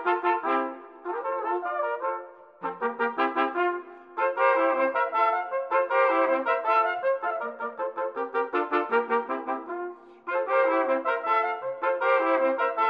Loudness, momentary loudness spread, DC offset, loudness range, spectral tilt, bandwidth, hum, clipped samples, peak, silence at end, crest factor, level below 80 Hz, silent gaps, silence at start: -26 LUFS; 12 LU; under 0.1%; 5 LU; -5.5 dB/octave; 5.2 kHz; none; under 0.1%; -10 dBFS; 0 s; 18 dB; -86 dBFS; none; 0 s